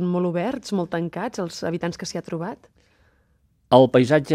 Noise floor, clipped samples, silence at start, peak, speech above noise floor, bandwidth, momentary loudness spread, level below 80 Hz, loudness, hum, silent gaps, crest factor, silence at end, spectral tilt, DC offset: -63 dBFS; under 0.1%; 0 s; 0 dBFS; 42 dB; 13.5 kHz; 15 LU; -60 dBFS; -22 LUFS; none; none; 22 dB; 0 s; -6.5 dB/octave; under 0.1%